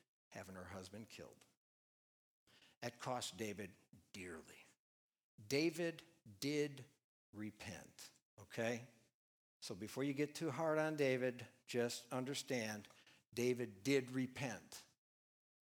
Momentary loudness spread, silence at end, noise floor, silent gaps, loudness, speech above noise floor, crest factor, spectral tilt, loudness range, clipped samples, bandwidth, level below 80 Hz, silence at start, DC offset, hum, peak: 19 LU; 0.85 s; under -90 dBFS; 1.57-2.47 s, 2.77-2.81 s, 4.79-5.12 s, 5.23-5.38 s, 7.04-7.33 s, 8.22-8.37 s, 9.14-9.60 s; -44 LUFS; over 46 dB; 22 dB; -4.5 dB/octave; 9 LU; under 0.1%; over 20 kHz; -84 dBFS; 0.3 s; under 0.1%; none; -24 dBFS